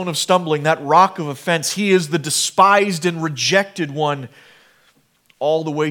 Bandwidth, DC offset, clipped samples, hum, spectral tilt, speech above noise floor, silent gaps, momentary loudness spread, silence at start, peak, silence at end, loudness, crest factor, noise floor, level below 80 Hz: 18.5 kHz; under 0.1%; under 0.1%; none; -3.5 dB/octave; 41 dB; none; 10 LU; 0 s; 0 dBFS; 0 s; -17 LUFS; 18 dB; -58 dBFS; -72 dBFS